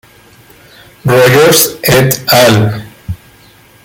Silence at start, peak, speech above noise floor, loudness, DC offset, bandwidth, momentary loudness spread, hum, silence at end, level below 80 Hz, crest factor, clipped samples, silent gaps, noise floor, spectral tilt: 1.05 s; 0 dBFS; 33 dB; -8 LUFS; under 0.1%; over 20 kHz; 20 LU; none; 0.7 s; -40 dBFS; 10 dB; 0.1%; none; -41 dBFS; -4 dB/octave